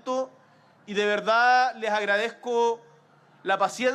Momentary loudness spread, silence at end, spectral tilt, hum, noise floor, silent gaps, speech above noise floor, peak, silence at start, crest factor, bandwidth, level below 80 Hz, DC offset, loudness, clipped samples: 13 LU; 0 s; -3 dB/octave; none; -57 dBFS; none; 34 dB; -10 dBFS; 0.05 s; 16 dB; 12.5 kHz; -82 dBFS; under 0.1%; -24 LUFS; under 0.1%